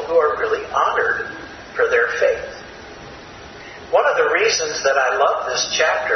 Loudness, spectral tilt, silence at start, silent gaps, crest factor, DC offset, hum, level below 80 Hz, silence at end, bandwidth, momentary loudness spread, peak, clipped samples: -18 LUFS; -1 dB/octave; 0 s; none; 16 dB; under 0.1%; none; -52 dBFS; 0 s; 6.4 kHz; 20 LU; -2 dBFS; under 0.1%